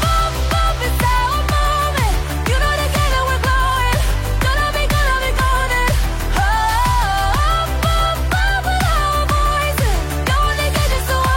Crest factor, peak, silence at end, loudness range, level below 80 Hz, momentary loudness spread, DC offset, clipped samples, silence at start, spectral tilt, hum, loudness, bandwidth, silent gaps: 10 dB; -4 dBFS; 0 s; 0 LU; -20 dBFS; 2 LU; under 0.1%; under 0.1%; 0 s; -4 dB/octave; none; -17 LUFS; 16.5 kHz; none